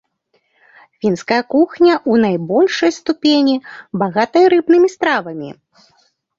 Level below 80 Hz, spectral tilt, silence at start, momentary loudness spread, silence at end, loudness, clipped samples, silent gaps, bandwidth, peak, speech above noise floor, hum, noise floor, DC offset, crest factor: -60 dBFS; -5.5 dB/octave; 1.05 s; 10 LU; 0.85 s; -14 LUFS; under 0.1%; none; 7.6 kHz; -2 dBFS; 49 dB; none; -63 dBFS; under 0.1%; 14 dB